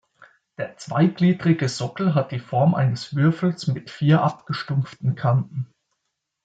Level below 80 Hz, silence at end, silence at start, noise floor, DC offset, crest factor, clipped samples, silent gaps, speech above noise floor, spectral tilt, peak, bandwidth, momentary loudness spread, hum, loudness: -64 dBFS; 0.8 s; 0.6 s; -79 dBFS; under 0.1%; 16 dB; under 0.1%; none; 57 dB; -7.5 dB/octave; -6 dBFS; 9 kHz; 12 LU; none; -22 LUFS